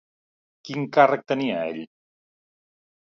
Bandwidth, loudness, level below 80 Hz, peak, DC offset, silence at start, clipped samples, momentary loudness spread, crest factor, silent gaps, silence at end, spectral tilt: 7 kHz; -22 LUFS; -74 dBFS; -4 dBFS; under 0.1%; 0.65 s; under 0.1%; 15 LU; 22 dB; none; 1.2 s; -6.5 dB/octave